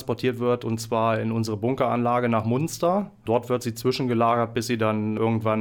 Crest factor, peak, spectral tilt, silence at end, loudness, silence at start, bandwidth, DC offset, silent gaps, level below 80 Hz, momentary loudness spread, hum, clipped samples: 16 dB; -8 dBFS; -6.5 dB/octave; 0 s; -24 LUFS; 0 s; 18.5 kHz; under 0.1%; none; -60 dBFS; 4 LU; none; under 0.1%